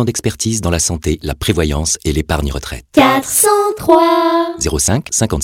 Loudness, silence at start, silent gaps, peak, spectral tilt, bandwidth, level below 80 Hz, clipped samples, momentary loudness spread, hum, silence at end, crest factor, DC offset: -14 LUFS; 0 s; none; 0 dBFS; -4 dB/octave; 17 kHz; -28 dBFS; under 0.1%; 8 LU; none; 0 s; 14 dB; under 0.1%